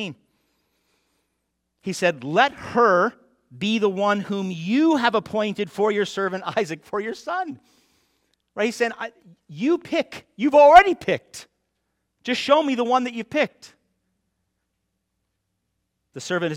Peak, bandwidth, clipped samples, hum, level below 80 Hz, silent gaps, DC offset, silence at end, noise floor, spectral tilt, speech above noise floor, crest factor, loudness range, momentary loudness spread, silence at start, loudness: 0 dBFS; 14 kHz; under 0.1%; none; -58 dBFS; none; under 0.1%; 0 s; -77 dBFS; -5 dB/octave; 56 dB; 22 dB; 9 LU; 15 LU; 0 s; -21 LUFS